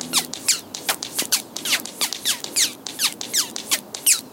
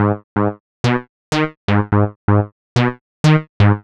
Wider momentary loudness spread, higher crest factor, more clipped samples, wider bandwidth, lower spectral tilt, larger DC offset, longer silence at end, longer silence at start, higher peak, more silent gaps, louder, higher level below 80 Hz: second, 4 LU vs 7 LU; about the same, 20 dB vs 16 dB; neither; first, 17 kHz vs 9.8 kHz; second, 1 dB/octave vs -7 dB/octave; neither; about the same, 0 s vs 0.05 s; about the same, 0 s vs 0 s; second, -4 dBFS vs 0 dBFS; second, none vs 0.24-0.36 s, 0.60-0.84 s, 1.09-1.32 s, 1.57-1.68 s, 2.16-2.28 s, 2.52-2.76 s, 3.01-3.24 s, 3.49-3.60 s; second, -21 LUFS vs -18 LUFS; second, -70 dBFS vs -42 dBFS